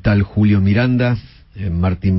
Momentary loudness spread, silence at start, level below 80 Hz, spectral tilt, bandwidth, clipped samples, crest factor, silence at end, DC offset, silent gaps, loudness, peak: 10 LU; 0.05 s; -34 dBFS; -12 dB/octave; 5.8 kHz; under 0.1%; 12 dB; 0 s; under 0.1%; none; -16 LUFS; -4 dBFS